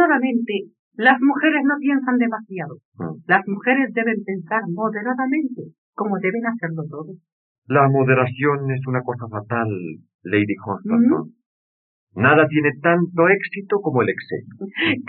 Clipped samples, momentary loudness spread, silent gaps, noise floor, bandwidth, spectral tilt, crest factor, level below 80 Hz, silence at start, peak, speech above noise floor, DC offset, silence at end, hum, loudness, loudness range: under 0.1%; 16 LU; 0.79-0.91 s, 2.85-2.92 s, 5.78-5.93 s, 7.32-7.62 s, 10.14-10.19 s, 11.46-12.07 s; under -90 dBFS; 4.4 kHz; -5 dB/octave; 18 dB; -76 dBFS; 0 s; -2 dBFS; over 70 dB; under 0.1%; 0 s; none; -20 LUFS; 4 LU